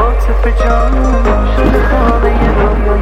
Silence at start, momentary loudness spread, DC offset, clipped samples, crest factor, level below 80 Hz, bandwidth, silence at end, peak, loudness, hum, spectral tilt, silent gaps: 0 s; 2 LU; under 0.1%; under 0.1%; 8 dB; -10 dBFS; 6.4 kHz; 0 s; 0 dBFS; -12 LUFS; none; -7.5 dB/octave; none